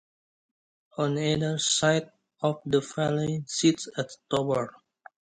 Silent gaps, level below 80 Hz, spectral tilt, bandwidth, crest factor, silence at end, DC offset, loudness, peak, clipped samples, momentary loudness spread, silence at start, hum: none; -62 dBFS; -4.5 dB/octave; 10.5 kHz; 20 dB; 0.7 s; under 0.1%; -27 LUFS; -8 dBFS; under 0.1%; 9 LU; 0.95 s; none